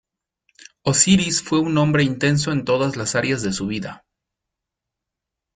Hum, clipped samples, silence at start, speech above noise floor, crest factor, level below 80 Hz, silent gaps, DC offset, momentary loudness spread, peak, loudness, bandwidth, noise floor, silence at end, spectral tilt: none; under 0.1%; 0.85 s; 65 dB; 20 dB; -52 dBFS; none; under 0.1%; 11 LU; -2 dBFS; -19 LUFS; 9.6 kHz; -84 dBFS; 1.6 s; -4 dB/octave